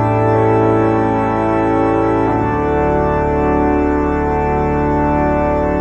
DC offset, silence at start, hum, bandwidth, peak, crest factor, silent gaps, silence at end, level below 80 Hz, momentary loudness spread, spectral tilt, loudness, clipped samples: under 0.1%; 0 s; none; 8.4 kHz; -2 dBFS; 12 dB; none; 0 s; -26 dBFS; 3 LU; -9.5 dB/octave; -15 LUFS; under 0.1%